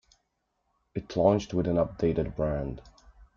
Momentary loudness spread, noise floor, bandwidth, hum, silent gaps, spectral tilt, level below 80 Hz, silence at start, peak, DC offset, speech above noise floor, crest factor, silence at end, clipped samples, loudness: 15 LU; -78 dBFS; 7.4 kHz; none; none; -8 dB/octave; -46 dBFS; 0.95 s; -8 dBFS; under 0.1%; 51 dB; 22 dB; 0.1 s; under 0.1%; -28 LUFS